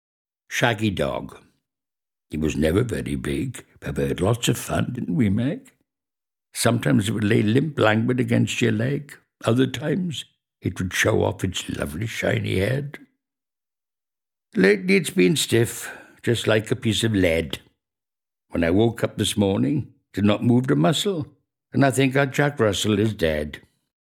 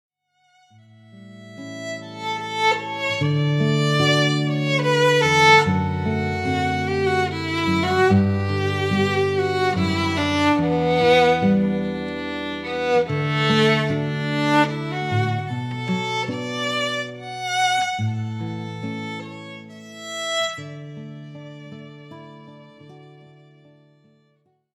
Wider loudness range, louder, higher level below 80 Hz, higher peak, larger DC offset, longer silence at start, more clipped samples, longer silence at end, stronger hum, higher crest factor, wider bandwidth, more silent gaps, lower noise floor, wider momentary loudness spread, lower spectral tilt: second, 4 LU vs 12 LU; about the same, -22 LUFS vs -21 LUFS; first, -46 dBFS vs -54 dBFS; first, 0 dBFS vs -4 dBFS; neither; second, 0.5 s vs 1.15 s; neither; second, 0.55 s vs 1.65 s; neither; about the same, 22 dB vs 18 dB; first, 17 kHz vs 13.5 kHz; neither; first, under -90 dBFS vs -65 dBFS; second, 12 LU vs 19 LU; about the same, -5.5 dB/octave vs -5.5 dB/octave